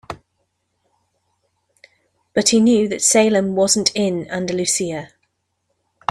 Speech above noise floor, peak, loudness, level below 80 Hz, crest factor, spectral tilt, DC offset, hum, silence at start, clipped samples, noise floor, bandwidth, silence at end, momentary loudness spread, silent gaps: 54 dB; -2 dBFS; -17 LUFS; -58 dBFS; 20 dB; -3 dB/octave; under 0.1%; none; 0.1 s; under 0.1%; -71 dBFS; 14.5 kHz; 1.05 s; 14 LU; none